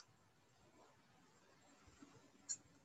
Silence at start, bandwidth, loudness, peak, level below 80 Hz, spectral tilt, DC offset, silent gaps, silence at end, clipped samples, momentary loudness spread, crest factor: 0 s; 11 kHz; -52 LUFS; -32 dBFS; -84 dBFS; -1 dB/octave; under 0.1%; none; 0 s; under 0.1%; 20 LU; 28 dB